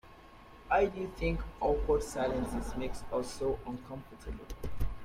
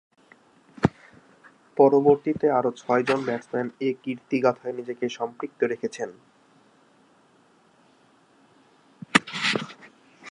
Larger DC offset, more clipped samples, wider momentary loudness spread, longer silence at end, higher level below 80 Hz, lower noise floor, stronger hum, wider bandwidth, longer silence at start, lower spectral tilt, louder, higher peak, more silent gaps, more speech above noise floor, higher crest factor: neither; neither; first, 16 LU vs 13 LU; about the same, 0 s vs 0 s; first, -42 dBFS vs -60 dBFS; second, -54 dBFS vs -60 dBFS; neither; first, 15.5 kHz vs 11 kHz; second, 0.05 s vs 0.8 s; about the same, -6 dB/octave vs -5 dB/octave; second, -34 LUFS vs -25 LUFS; second, -16 dBFS vs 0 dBFS; neither; second, 20 dB vs 36 dB; second, 18 dB vs 26 dB